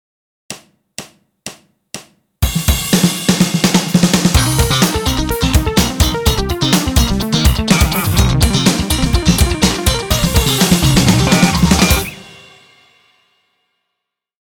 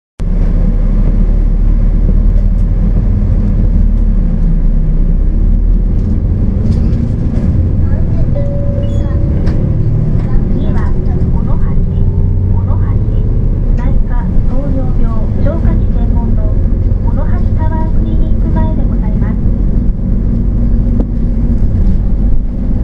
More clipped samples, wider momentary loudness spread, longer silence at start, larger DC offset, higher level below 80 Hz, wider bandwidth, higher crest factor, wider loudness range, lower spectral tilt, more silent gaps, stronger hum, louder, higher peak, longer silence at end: neither; first, 21 LU vs 2 LU; first, 0.5 s vs 0.2 s; neither; second, -22 dBFS vs -10 dBFS; first, over 20 kHz vs 2.4 kHz; about the same, 14 dB vs 10 dB; first, 4 LU vs 1 LU; second, -4 dB/octave vs -11 dB/octave; neither; neither; about the same, -13 LUFS vs -14 LUFS; about the same, 0 dBFS vs 0 dBFS; first, 2.15 s vs 0 s